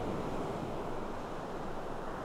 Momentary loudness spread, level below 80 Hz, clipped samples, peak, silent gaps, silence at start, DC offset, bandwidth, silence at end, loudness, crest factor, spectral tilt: 4 LU; -46 dBFS; under 0.1%; -26 dBFS; none; 0 s; under 0.1%; 14 kHz; 0 s; -40 LUFS; 12 dB; -6.5 dB/octave